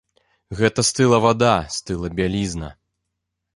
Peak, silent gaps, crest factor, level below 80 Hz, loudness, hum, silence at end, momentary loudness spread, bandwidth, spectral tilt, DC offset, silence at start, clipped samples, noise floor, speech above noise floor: -2 dBFS; none; 20 dB; -42 dBFS; -19 LUFS; none; 0.85 s; 14 LU; 11.5 kHz; -4.5 dB/octave; under 0.1%; 0.5 s; under 0.1%; -79 dBFS; 60 dB